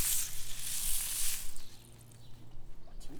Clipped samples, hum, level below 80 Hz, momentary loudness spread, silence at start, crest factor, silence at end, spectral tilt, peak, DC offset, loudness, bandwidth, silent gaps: under 0.1%; none; -44 dBFS; 23 LU; 0 s; 16 dB; 0 s; 0 dB/octave; -16 dBFS; under 0.1%; -35 LUFS; over 20 kHz; none